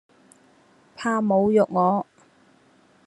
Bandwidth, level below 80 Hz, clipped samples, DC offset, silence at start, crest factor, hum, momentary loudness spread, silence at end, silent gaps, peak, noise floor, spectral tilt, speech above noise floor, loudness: 11.5 kHz; -66 dBFS; under 0.1%; under 0.1%; 1 s; 18 dB; none; 10 LU; 1.05 s; none; -6 dBFS; -58 dBFS; -7.5 dB/octave; 37 dB; -22 LUFS